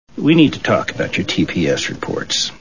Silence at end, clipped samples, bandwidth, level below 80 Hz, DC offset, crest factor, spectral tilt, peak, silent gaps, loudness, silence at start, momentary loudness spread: 0.05 s; under 0.1%; 7.4 kHz; -44 dBFS; 0.9%; 18 dB; -4.5 dB/octave; 0 dBFS; none; -17 LUFS; 0.15 s; 8 LU